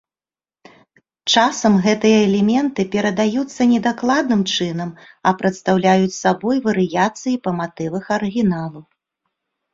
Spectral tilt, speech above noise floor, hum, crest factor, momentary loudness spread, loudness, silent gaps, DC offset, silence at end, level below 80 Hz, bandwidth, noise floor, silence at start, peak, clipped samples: -5 dB/octave; over 73 dB; none; 16 dB; 9 LU; -18 LUFS; none; under 0.1%; 0.9 s; -56 dBFS; 7.8 kHz; under -90 dBFS; 1.25 s; -2 dBFS; under 0.1%